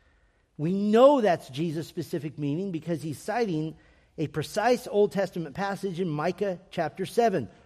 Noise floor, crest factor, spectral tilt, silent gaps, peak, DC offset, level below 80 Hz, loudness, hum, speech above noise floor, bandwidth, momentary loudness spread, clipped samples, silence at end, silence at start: -65 dBFS; 22 dB; -6.5 dB/octave; none; -6 dBFS; under 0.1%; -64 dBFS; -27 LUFS; none; 38 dB; 15 kHz; 12 LU; under 0.1%; 0.2 s; 0.6 s